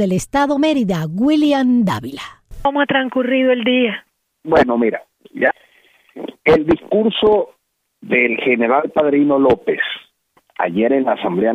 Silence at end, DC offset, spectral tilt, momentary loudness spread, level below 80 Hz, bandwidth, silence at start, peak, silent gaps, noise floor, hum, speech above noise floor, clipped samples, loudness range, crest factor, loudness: 0 s; under 0.1%; -6 dB/octave; 16 LU; -46 dBFS; 15 kHz; 0 s; -2 dBFS; none; -59 dBFS; none; 43 dB; under 0.1%; 2 LU; 14 dB; -16 LUFS